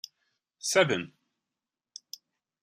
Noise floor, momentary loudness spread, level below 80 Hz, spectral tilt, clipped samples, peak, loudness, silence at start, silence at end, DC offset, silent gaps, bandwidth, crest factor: -89 dBFS; 24 LU; -78 dBFS; -3 dB/octave; under 0.1%; -8 dBFS; -27 LUFS; 0.65 s; 1.55 s; under 0.1%; none; 15.5 kHz; 26 dB